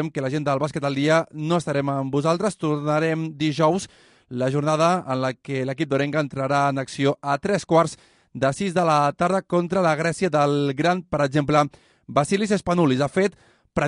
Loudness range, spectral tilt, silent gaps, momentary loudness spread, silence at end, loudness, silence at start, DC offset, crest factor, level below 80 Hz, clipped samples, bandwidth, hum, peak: 2 LU; -6 dB/octave; none; 6 LU; 0 s; -22 LUFS; 0 s; under 0.1%; 18 dB; -56 dBFS; under 0.1%; 11 kHz; none; -4 dBFS